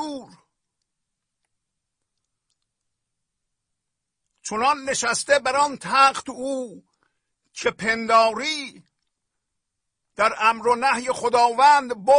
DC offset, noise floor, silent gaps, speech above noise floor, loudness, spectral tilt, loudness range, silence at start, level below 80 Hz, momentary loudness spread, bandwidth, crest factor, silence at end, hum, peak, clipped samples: under 0.1%; -82 dBFS; none; 62 dB; -20 LUFS; -2 dB/octave; 7 LU; 0 s; -64 dBFS; 15 LU; 10.5 kHz; 18 dB; 0 s; none; -6 dBFS; under 0.1%